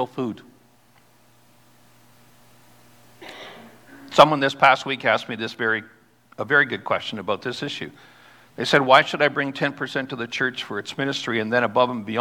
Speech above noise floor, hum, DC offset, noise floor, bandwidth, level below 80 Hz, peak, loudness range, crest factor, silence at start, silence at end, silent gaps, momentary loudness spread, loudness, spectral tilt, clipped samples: 36 dB; none; under 0.1%; -57 dBFS; 19 kHz; -66 dBFS; 0 dBFS; 5 LU; 22 dB; 0 s; 0 s; none; 17 LU; -21 LUFS; -4.5 dB/octave; under 0.1%